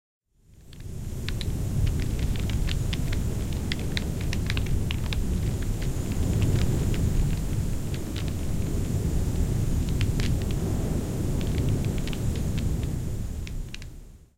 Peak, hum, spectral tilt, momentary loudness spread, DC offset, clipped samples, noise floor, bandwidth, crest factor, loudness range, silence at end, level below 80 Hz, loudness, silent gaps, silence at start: -8 dBFS; none; -6 dB/octave; 7 LU; under 0.1%; under 0.1%; -52 dBFS; 16.5 kHz; 18 dB; 2 LU; 0.2 s; -30 dBFS; -29 LUFS; none; 0.5 s